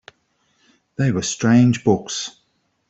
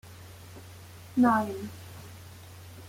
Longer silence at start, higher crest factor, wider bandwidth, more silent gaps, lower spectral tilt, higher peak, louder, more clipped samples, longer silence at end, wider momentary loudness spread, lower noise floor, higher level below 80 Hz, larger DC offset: first, 1 s vs 0.05 s; about the same, 18 dB vs 20 dB; second, 8.2 kHz vs 16.5 kHz; neither; about the same, -5.5 dB/octave vs -6 dB/octave; first, -4 dBFS vs -12 dBFS; first, -18 LUFS vs -27 LUFS; neither; first, 0.6 s vs 0 s; second, 14 LU vs 24 LU; first, -65 dBFS vs -47 dBFS; first, -56 dBFS vs -64 dBFS; neither